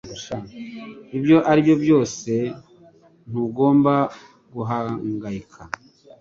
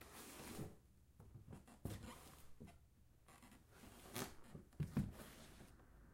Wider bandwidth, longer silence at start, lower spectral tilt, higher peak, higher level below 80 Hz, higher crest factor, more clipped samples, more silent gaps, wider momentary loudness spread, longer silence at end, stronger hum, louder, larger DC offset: second, 7.6 kHz vs 16.5 kHz; about the same, 0.05 s vs 0 s; first, -7 dB/octave vs -5.5 dB/octave; first, -4 dBFS vs -30 dBFS; first, -56 dBFS vs -66 dBFS; second, 18 dB vs 24 dB; neither; neither; about the same, 19 LU vs 19 LU; first, 0.55 s vs 0 s; neither; first, -20 LUFS vs -53 LUFS; neither